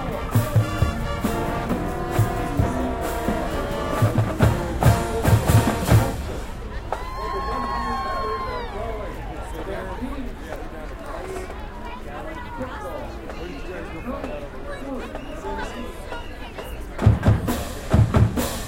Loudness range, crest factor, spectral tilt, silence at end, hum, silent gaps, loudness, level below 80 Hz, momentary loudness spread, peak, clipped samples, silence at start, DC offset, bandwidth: 12 LU; 20 dB; -6.5 dB/octave; 0 s; none; none; -25 LUFS; -32 dBFS; 15 LU; -4 dBFS; under 0.1%; 0 s; 0.1%; 16.5 kHz